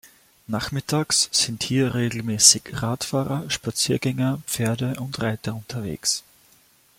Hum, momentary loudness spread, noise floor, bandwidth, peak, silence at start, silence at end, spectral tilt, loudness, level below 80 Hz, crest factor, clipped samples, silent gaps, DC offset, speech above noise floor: none; 14 LU; -57 dBFS; 16.5 kHz; 0 dBFS; 0.05 s; 0.8 s; -3 dB/octave; -22 LUFS; -54 dBFS; 24 dB; under 0.1%; none; under 0.1%; 34 dB